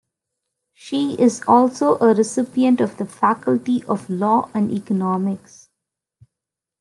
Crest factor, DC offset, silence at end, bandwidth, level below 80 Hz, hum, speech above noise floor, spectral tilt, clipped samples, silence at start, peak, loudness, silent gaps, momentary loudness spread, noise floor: 18 dB; under 0.1%; 1.45 s; 11.5 kHz; -70 dBFS; none; 67 dB; -6.5 dB/octave; under 0.1%; 0.85 s; -2 dBFS; -19 LUFS; none; 8 LU; -85 dBFS